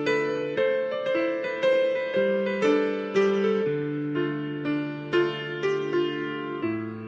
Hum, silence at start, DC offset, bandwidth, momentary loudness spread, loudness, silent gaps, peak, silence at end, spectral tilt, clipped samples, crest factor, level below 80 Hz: none; 0 s; under 0.1%; 8 kHz; 7 LU; -26 LUFS; none; -12 dBFS; 0 s; -6.5 dB/octave; under 0.1%; 14 dB; -70 dBFS